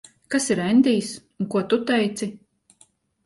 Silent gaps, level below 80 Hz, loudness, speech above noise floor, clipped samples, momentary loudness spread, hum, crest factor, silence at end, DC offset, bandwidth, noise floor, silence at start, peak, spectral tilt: none; -64 dBFS; -22 LUFS; 38 dB; under 0.1%; 13 LU; none; 18 dB; 0.9 s; under 0.1%; 11.5 kHz; -60 dBFS; 0.3 s; -6 dBFS; -4.5 dB/octave